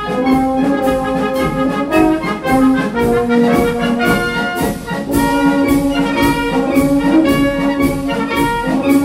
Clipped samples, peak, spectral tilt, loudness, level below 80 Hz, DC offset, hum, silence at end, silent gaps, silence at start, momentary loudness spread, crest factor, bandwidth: under 0.1%; 0 dBFS; -6 dB/octave; -14 LUFS; -32 dBFS; 0.1%; none; 0 s; none; 0 s; 5 LU; 14 dB; 16.5 kHz